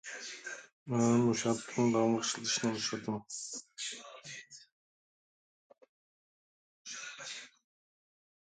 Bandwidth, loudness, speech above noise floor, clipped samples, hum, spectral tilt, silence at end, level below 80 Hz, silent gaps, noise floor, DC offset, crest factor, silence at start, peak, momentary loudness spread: 9.4 kHz; -34 LUFS; over 58 dB; under 0.1%; none; -4 dB/octave; 0.95 s; -76 dBFS; 0.73-0.86 s, 4.72-5.70 s, 5.89-6.85 s; under -90 dBFS; under 0.1%; 20 dB; 0.05 s; -18 dBFS; 18 LU